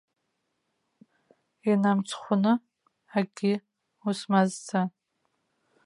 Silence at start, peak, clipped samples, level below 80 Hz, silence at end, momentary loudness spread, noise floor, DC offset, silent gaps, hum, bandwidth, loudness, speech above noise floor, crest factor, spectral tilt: 1.65 s; -8 dBFS; under 0.1%; -80 dBFS; 0.95 s; 9 LU; -79 dBFS; under 0.1%; none; none; 11 kHz; -27 LUFS; 53 dB; 22 dB; -6 dB/octave